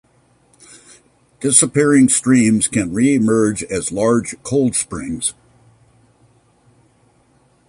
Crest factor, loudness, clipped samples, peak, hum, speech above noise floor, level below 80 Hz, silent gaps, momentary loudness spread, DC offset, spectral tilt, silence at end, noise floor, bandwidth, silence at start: 18 dB; -15 LUFS; under 0.1%; 0 dBFS; none; 40 dB; -50 dBFS; none; 10 LU; under 0.1%; -4.5 dB/octave; 2.35 s; -56 dBFS; 11.5 kHz; 1.4 s